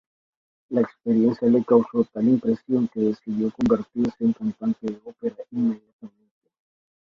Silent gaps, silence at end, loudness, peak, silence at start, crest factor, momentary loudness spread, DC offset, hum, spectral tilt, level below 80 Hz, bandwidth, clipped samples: 5.93-5.99 s; 0.95 s; -23 LUFS; -4 dBFS; 0.7 s; 18 dB; 11 LU; under 0.1%; none; -9.5 dB/octave; -60 dBFS; 6.4 kHz; under 0.1%